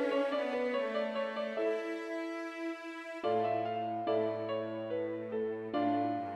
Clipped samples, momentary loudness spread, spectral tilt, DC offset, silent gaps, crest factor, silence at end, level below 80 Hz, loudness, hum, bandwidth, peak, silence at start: under 0.1%; 7 LU; -6.5 dB/octave; under 0.1%; none; 14 dB; 0 s; -80 dBFS; -35 LUFS; none; 11 kHz; -20 dBFS; 0 s